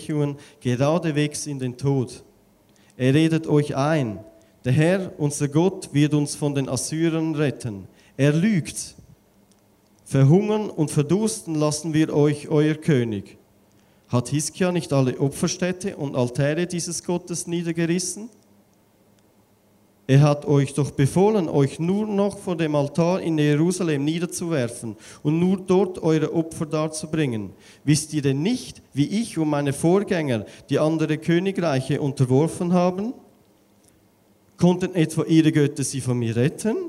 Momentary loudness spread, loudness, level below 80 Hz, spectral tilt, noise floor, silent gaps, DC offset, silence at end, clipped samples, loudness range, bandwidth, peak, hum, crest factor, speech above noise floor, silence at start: 9 LU; -22 LUFS; -58 dBFS; -6 dB/octave; -58 dBFS; none; under 0.1%; 0 s; under 0.1%; 3 LU; 13.5 kHz; -4 dBFS; none; 18 dB; 37 dB; 0 s